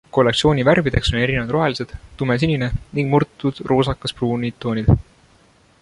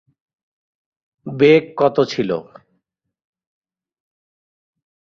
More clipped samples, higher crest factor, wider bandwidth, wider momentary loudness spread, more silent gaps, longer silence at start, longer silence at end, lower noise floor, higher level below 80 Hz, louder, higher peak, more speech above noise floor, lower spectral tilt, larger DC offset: neither; about the same, 18 dB vs 20 dB; first, 11.5 kHz vs 7.2 kHz; second, 8 LU vs 17 LU; neither; second, 0.15 s vs 1.25 s; second, 0.8 s vs 2.7 s; second, -54 dBFS vs -71 dBFS; first, -34 dBFS vs -62 dBFS; second, -19 LUFS vs -16 LUFS; about the same, -2 dBFS vs -2 dBFS; second, 35 dB vs 55 dB; about the same, -6.5 dB/octave vs -6.5 dB/octave; neither